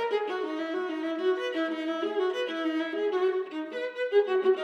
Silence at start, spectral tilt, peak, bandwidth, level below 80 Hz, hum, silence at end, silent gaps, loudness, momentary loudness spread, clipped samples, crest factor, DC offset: 0 s; -3.5 dB/octave; -12 dBFS; 7.8 kHz; -88 dBFS; none; 0 s; none; -29 LUFS; 7 LU; under 0.1%; 16 dB; under 0.1%